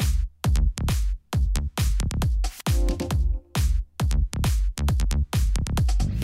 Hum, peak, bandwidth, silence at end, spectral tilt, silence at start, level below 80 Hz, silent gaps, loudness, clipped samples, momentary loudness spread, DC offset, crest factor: none; -8 dBFS; 16 kHz; 0 s; -5.5 dB/octave; 0 s; -24 dBFS; none; -26 LUFS; under 0.1%; 2 LU; under 0.1%; 14 dB